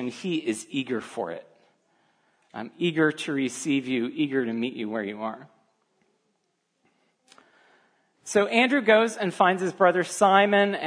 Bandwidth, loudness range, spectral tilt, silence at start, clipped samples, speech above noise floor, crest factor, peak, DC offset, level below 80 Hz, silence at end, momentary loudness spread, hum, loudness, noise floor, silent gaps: 11 kHz; 13 LU; -4.5 dB/octave; 0 s; under 0.1%; 50 dB; 22 dB; -4 dBFS; under 0.1%; -78 dBFS; 0 s; 15 LU; none; -24 LUFS; -75 dBFS; none